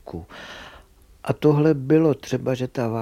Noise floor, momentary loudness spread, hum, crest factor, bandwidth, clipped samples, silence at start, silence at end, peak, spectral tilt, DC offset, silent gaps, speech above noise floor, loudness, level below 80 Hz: -50 dBFS; 20 LU; none; 16 dB; 14 kHz; under 0.1%; 0.05 s; 0 s; -6 dBFS; -8 dB/octave; under 0.1%; none; 29 dB; -21 LUFS; -52 dBFS